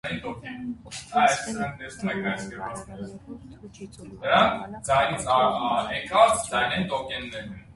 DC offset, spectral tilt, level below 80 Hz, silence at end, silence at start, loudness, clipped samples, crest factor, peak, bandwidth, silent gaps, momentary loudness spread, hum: under 0.1%; -3.5 dB/octave; -52 dBFS; 0 s; 0.05 s; -25 LUFS; under 0.1%; 22 dB; -4 dBFS; 11.5 kHz; none; 21 LU; none